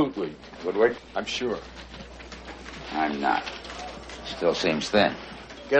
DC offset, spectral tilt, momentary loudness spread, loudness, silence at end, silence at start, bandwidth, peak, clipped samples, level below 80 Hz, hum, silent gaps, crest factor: under 0.1%; -4.5 dB/octave; 18 LU; -27 LUFS; 0 s; 0 s; 8.4 kHz; -6 dBFS; under 0.1%; -50 dBFS; none; none; 22 dB